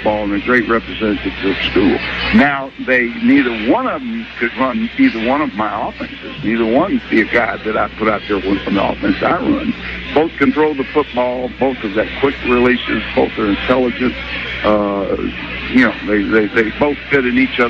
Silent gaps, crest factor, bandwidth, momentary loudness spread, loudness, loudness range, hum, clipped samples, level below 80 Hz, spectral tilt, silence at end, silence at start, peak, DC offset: none; 14 dB; 6.6 kHz; 7 LU; -15 LUFS; 2 LU; none; under 0.1%; -36 dBFS; -7 dB/octave; 0 s; 0 s; -2 dBFS; under 0.1%